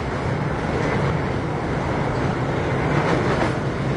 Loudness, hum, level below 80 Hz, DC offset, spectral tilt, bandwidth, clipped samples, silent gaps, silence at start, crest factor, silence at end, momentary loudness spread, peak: -22 LUFS; none; -36 dBFS; under 0.1%; -7 dB/octave; 10.5 kHz; under 0.1%; none; 0 s; 14 dB; 0 s; 4 LU; -8 dBFS